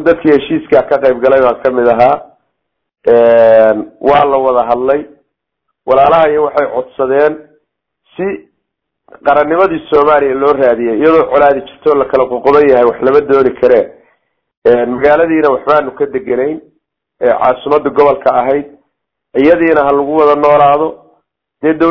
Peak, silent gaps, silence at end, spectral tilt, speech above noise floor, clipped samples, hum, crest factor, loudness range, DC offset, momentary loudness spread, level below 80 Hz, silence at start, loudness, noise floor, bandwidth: 0 dBFS; 14.57-14.62 s; 0 s; -8 dB/octave; 62 dB; 1%; none; 10 dB; 4 LU; under 0.1%; 10 LU; -44 dBFS; 0 s; -10 LUFS; -72 dBFS; 6 kHz